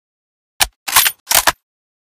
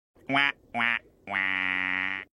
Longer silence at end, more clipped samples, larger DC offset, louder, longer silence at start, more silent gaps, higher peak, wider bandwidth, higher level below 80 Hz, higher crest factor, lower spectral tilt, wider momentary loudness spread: first, 0.65 s vs 0.1 s; first, 0.1% vs under 0.1%; neither; first, -13 LUFS vs -27 LUFS; first, 0.6 s vs 0.3 s; first, 0.76-0.86 s, 1.20-1.26 s vs none; first, 0 dBFS vs -8 dBFS; first, over 20 kHz vs 11.5 kHz; first, -42 dBFS vs -68 dBFS; about the same, 18 dB vs 20 dB; second, 1.5 dB/octave vs -4.5 dB/octave; about the same, 6 LU vs 4 LU